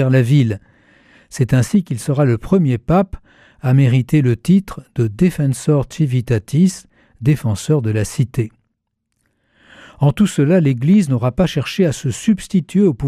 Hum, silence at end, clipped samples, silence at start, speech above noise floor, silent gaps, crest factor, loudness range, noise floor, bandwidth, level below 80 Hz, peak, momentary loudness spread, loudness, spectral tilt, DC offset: none; 0 s; under 0.1%; 0 s; 57 dB; none; 12 dB; 4 LU; -72 dBFS; 14 kHz; -42 dBFS; -4 dBFS; 8 LU; -16 LUFS; -7.5 dB/octave; under 0.1%